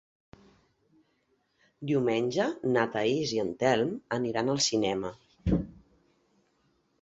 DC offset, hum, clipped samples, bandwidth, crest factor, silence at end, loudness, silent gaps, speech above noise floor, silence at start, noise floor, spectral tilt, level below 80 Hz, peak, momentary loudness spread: under 0.1%; none; under 0.1%; 8.4 kHz; 20 dB; 1.3 s; -29 LUFS; none; 45 dB; 1.8 s; -73 dBFS; -4.5 dB/octave; -50 dBFS; -12 dBFS; 8 LU